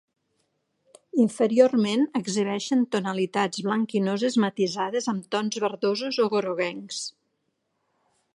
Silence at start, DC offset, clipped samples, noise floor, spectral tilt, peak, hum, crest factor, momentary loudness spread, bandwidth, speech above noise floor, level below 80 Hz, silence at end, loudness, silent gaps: 1.15 s; under 0.1%; under 0.1%; -76 dBFS; -5 dB/octave; -4 dBFS; none; 20 dB; 8 LU; 11.5 kHz; 51 dB; -78 dBFS; 1.25 s; -25 LUFS; none